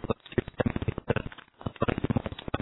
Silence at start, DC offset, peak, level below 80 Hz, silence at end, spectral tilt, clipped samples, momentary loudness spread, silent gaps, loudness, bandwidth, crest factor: 0 s; under 0.1%; -10 dBFS; -44 dBFS; 0 s; -11 dB/octave; under 0.1%; 10 LU; none; -32 LUFS; 4.1 kHz; 22 dB